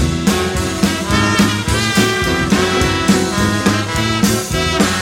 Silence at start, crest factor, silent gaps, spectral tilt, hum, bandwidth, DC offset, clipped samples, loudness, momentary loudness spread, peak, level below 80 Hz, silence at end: 0 s; 14 dB; none; -4 dB/octave; none; 16.5 kHz; under 0.1%; under 0.1%; -15 LUFS; 3 LU; 0 dBFS; -28 dBFS; 0 s